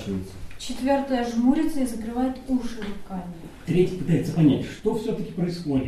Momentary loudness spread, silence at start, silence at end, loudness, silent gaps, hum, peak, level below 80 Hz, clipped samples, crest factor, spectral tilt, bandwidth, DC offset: 15 LU; 0 s; 0 s; -25 LUFS; none; none; -8 dBFS; -44 dBFS; under 0.1%; 16 dB; -7 dB/octave; 13.5 kHz; under 0.1%